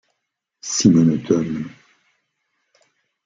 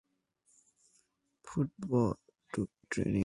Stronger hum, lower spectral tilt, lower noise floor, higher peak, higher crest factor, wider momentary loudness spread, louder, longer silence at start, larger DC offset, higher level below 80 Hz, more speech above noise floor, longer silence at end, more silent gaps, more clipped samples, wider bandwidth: neither; second, -5.5 dB/octave vs -7.5 dB/octave; first, -78 dBFS vs -74 dBFS; first, -2 dBFS vs -16 dBFS; about the same, 20 dB vs 20 dB; first, 19 LU vs 11 LU; first, -18 LUFS vs -36 LUFS; second, 0.65 s vs 1.45 s; neither; about the same, -58 dBFS vs -58 dBFS; first, 61 dB vs 43 dB; first, 1.55 s vs 0 s; neither; neither; second, 9 kHz vs 11.5 kHz